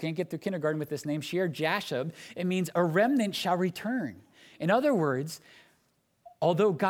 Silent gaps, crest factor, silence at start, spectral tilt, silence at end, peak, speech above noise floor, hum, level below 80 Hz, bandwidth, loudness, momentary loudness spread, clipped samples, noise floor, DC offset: none; 18 dB; 0 s; -6 dB/octave; 0 s; -12 dBFS; 43 dB; none; -76 dBFS; 18 kHz; -29 LUFS; 9 LU; under 0.1%; -72 dBFS; under 0.1%